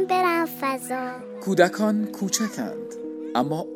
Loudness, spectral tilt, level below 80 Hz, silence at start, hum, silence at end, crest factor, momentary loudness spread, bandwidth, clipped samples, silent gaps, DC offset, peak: -25 LUFS; -4.5 dB/octave; -76 dBFS; 0 s; none; 0 s; 22 dB; 13 LU; 18 kHz; under 0.1%; none; under 0.1%; -2 dBFS